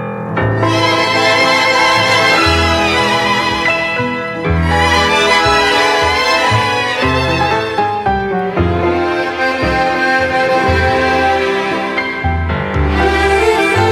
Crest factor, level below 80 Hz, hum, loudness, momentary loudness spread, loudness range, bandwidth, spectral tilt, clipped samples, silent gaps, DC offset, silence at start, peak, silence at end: 12 dB; -28 dBFS; none; -12 LUFS; 7 LU; 3 LU; 15.5 kHz; -4.5 dB/octave; under 0.1%; none; under 0.1%; 0 s; 0 dBFS; 0 s